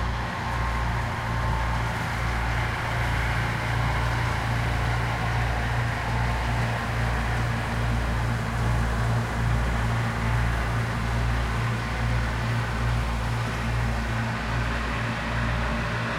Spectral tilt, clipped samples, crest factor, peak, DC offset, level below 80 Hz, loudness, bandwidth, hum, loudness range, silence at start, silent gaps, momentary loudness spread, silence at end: -5.5 dB/octave; under 0.1%; 12 dB; -12 dBFS; under 0.1%; -30 dBFS; -27 LUFS; 15 kHz; none; 1 LU; 0 s; none; 2 LU; 0 s